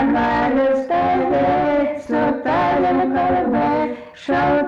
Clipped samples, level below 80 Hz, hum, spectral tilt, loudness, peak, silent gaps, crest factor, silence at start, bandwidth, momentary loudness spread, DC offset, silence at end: under 0.1%; -44 dBFS; none; -7.5 dB/octave; -18 LUFS; -10 dBFS; none; 8 dB; 0 s; 7.4 kHz; 4 LU; under 0.1%; 0 s